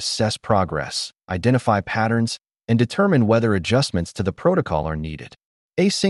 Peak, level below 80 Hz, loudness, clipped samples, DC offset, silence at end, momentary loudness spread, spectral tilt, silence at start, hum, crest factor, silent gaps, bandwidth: -2 dBFS; -44 dBFS; -21 LUFS; under 0.1%; under 0.1%; 0 s; 10 LU; -5.5 dB/octave; 0 s; none; 18 dB; 5.45-5.69 s; 11.5 kHz